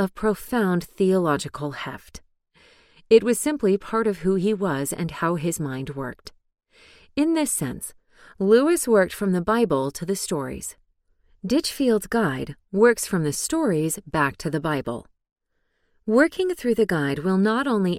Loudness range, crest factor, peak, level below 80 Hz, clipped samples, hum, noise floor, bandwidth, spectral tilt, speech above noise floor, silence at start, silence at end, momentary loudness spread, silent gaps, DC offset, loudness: 4 LU; 20 dB; -4 dBFS; -52 dBFS; under 0.1%; none; -71 dBFS; 16.5 kHz; -5 dB/octave; 49 dB; 0 s; 0 s; 13 LU; 15.32-15.36 s; under 0.1%; -23 LUFS